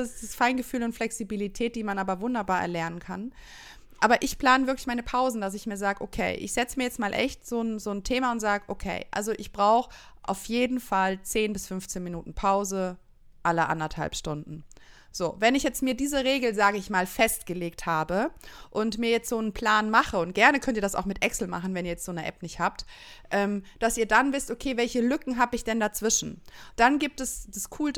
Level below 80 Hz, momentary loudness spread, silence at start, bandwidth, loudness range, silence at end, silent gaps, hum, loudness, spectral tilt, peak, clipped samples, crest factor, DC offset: -48 dBFS; 12 LU; 0 s; 19 kHz; 4 LU; 0 s; none; none; -27 LUFS; -3.5 dB/octave; -4 dBFS; under 0.1%; 22 dB; under 0.1%